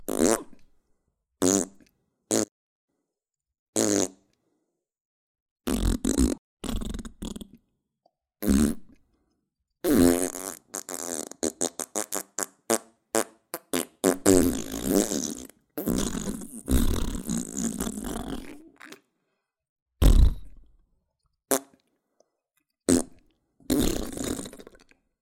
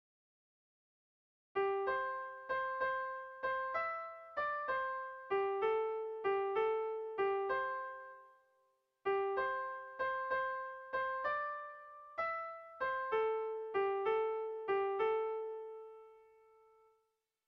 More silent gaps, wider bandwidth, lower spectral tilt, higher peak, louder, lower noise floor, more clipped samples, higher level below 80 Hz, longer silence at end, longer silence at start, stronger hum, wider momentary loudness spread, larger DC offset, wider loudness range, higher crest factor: first, 2.51-2.88 s, 3.59-3.73 s, 5.00-5.56 s, 6.38-6.57 s, 19.69-19.76 s, 19.82-19.86 s vs none; first, 17 kHz vs 5.8 kHz; second, -4.5 dB/octave vs -6 dB/octave; first, 0 dBFS vs -24 dBFS; first, -27 LUFS vs -38 LUFS; first, -87 dBFS vs -83 dBFS; neither; first, -34 dBFS vs -76 dBFS; second, 0.6 s vs 1.25 s; second, 0 s vs 1.55 s; neither; first, 16 LU vs 10 LU; neither; first, 6 LU vs 3 LU; first, 28 dB vs 14 dB